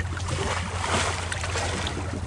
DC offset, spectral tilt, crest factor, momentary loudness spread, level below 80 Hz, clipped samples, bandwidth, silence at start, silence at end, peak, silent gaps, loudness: under 0.1%; -3.5 dB/octave; 18 dB; 4 LU; -40 dBFS; under 0.1%; 11.5 kHz; 0 s; 0 s; -10 dBFS; none; -27 LUFS